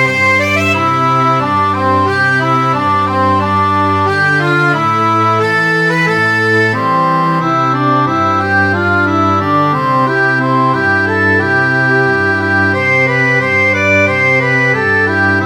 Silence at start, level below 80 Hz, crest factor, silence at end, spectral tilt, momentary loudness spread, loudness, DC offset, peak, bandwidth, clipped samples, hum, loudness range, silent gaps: 0 s; -54 dBFS; 12 dB; 0 s; -6 dB/octave; 2 LU; -11 LUFS; under 0.1%; 0 dBFS; 18.5 kHz; under 0.1%; none; 1 LU; none